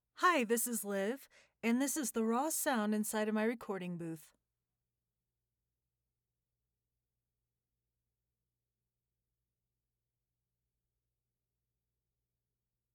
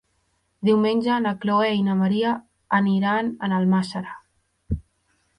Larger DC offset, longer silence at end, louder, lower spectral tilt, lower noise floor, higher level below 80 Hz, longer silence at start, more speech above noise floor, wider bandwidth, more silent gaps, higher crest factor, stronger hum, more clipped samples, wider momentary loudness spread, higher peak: neither; first, 8.7 s vs 0.6 s; second, -35 LUFS vs -22 LUFS; second, -3.5 dB/octave vs -7.5 dB/octave; first, under -90 dBFS vs -69 dBFS; second, -86 dBFS vs -46 dBFS; second, 0.2 s vs 0.6 s; first, over 55 dB vs 48 dB; first, over 20 kHz vs 10.5 kHz; neither; first, 22 dB vs 16 dB; neither; neither; about the same, 11 LU vs 12 LU; second, -18 dBFS vs -6 dBFS